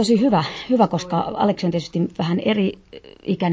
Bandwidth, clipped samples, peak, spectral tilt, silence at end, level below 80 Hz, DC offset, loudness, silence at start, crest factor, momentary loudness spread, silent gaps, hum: 8 kHz; under 0.1%; -4 dBFS; -6.5 dB/octave; 0 s; -54 dBFS; under 0.1%; -21 LUFS; 0 s; 16 dB; 7 LU; none; none